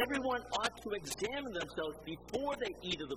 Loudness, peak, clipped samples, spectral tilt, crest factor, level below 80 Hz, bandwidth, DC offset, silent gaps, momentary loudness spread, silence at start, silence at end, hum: -38 LUFS; -18 dBFS; under 0.1%; -3 dB/octave; 20 dB; -60 dBFS; 16 kHz; under 0.1%; none; 6 LU; 0 s; 0 s; none